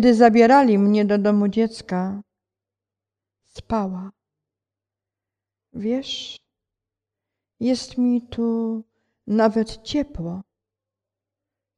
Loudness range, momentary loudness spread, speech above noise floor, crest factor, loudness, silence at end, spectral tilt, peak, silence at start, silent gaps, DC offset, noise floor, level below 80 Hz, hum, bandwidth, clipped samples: 13 LU; 18 LU; 69 dB; 22 dB; -20 LUFS; 1.35 s; -6.5 dB/octave; -2 dBFS; 0 s; none; under 0.1%; -88 dBFS; -52 dBFS; none; 9.8 kHz; under 0.1%